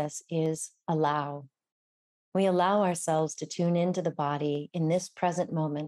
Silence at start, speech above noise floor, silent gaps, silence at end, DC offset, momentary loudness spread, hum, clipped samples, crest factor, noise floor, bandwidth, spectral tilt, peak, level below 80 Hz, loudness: 0 s; over 61 dB; 1.72-2.32 s; 0 s; under 0.1%; 7 LU; none; under 0.1%; 16 dB; under -90 dBFS; 13.5 kHz; -6 dB/octave; -14 dBFS; -78 dBFS; -29 LUFS